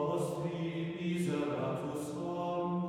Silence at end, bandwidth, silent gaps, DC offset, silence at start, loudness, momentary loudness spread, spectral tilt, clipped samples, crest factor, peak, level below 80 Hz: 0 s; 15 kHz; none; under 0.1%; 0 s; -36 LUFS; 4 LU; -7 dB/octave; under 0.1%; 12 dB; -22 dBFS; -70 dBFS